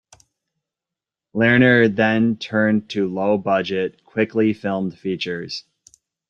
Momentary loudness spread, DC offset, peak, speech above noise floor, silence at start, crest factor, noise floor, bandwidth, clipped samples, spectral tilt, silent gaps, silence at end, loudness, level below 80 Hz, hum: 11 LU; under 0.1%; -2 dBFS; 68 dB; 1.35 s; 18 dB; -87 dBFS; 7.6 kHz; under 0.1%; -7 dB/octave; none; 0.7 s; -19 LUFS; -60 dBFS; none